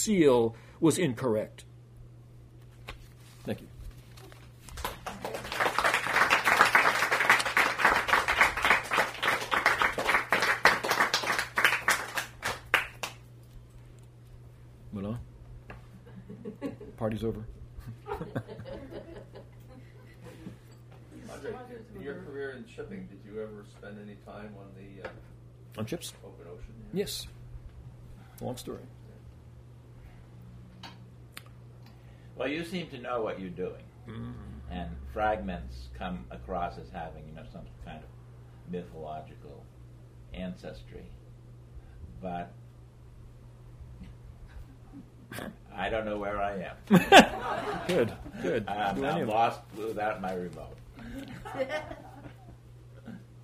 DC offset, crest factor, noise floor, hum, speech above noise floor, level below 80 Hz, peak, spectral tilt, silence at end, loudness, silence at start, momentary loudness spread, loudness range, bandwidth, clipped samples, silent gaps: under 0.1%; 28 dB; -51 dBFS; none; 20 dB; -52 dBFS; -4 dBFS; -4 dB/octave; 0 s; -28 LUFS; 0 s; 26 LU; 21 LU; 15.5 kHz; under 0.1%; none